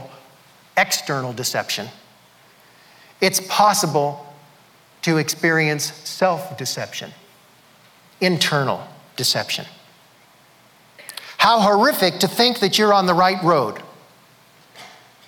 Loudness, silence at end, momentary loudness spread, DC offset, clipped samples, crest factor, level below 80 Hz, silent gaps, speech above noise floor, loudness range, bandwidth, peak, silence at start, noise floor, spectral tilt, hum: -19 LUFS; 0.4 s; 17 LU; under 0.1%; under 0.1%; 18 dB; -66 dBFS; none; 33 dB; 6 LU; 20 kHz; -4 dBFS; 0 s; -52 dBFS; -3.5 dB/octave; none